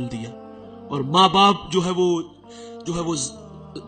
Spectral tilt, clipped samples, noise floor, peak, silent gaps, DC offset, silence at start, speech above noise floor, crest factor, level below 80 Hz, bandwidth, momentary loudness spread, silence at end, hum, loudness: -4.5 dB/octave; under 0.1%; -40 dBFS; -4 dBFS; none; under 0.1%; 0 s; 19 dB; 18 dB; -52 dBFS; 9.2 kHz; 25 LU; 0 s; none; -20 LUFS